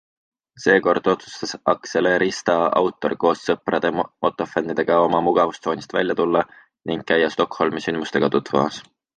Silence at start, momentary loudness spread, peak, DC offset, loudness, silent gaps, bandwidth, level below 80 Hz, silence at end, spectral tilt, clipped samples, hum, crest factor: 0.55 s; 7 LU; -2 dBFS; under 0.1%; -21 LUFS; none; 9.4 kHz; -58 dBFS; 0.35 s; -5 dB/octave; under 0.1%; none; 18 dB